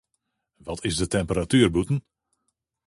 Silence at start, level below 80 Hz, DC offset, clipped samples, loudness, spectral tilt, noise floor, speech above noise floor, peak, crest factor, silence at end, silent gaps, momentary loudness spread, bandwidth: 0.65 s; -44 dBFS; under 0.1%; under 0.1%; -24 LUFS; -5.5 dB/octave; -78 dBFS; 55 dB; -4 dBFS; 22 dB; 0.9 s; none; 13 LU; 11.5 kHz